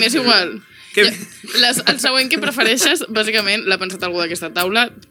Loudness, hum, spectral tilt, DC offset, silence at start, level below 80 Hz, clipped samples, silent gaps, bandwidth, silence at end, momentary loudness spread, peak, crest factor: -15 LUFS; none; -1.5 dB/octave; under 0.1%; 0 s; -64 dBFS; under 0.1%; none; 18.5 kHz; 0.1 s; 8 LU; 0 dBFS; 18 dB